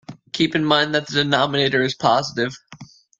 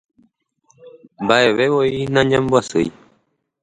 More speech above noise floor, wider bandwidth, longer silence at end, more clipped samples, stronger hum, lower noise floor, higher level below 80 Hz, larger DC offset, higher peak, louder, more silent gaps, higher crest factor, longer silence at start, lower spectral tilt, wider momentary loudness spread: second, 24 dB vs 48 dB; about the same, 9 kHz vs 9.6 kHz; second, 0.35 s vs 0.7 s; neither; neither; second, -43 dBFS vs -64 dBFS; second, -58 dBFS vs -52 dBFS; neither; about the same, 0 dBFS vs 0 dBFS; about the same, -19 LUFS vs -17 LUFS; neither; about the same, 20 dB vs 18 dB; second, 0.1 s vs 0.85 s; about the same, -4.5 dB/octave vs -5.5 dB/octave; about the same, 9 LU vs 8 LU